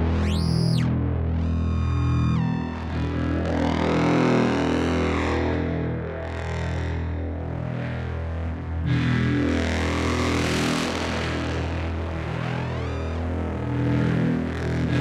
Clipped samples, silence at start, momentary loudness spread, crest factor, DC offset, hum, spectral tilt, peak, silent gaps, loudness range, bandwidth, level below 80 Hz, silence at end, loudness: under 0.1%; 0 s; 7 LU; 16 dB; under 0.1%; none; -6.5 dB/octave; -6 dBFS; none; 4 LU; 11.5 kHz; -38 dBFS; 0 s; -25 LUFS